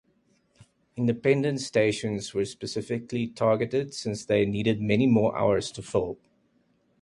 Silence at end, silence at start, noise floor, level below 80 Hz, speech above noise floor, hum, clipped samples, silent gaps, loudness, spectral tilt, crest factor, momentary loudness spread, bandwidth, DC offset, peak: 0.85 s; 0.6 s; -68 dBFS; -58 dBFS; 42 dB; none; under 0.1%; none; -26 LUFS; -6 dB/octave; 18 dB; 9 LU; 11.5 kHz; under 0.1%; -8 dBFS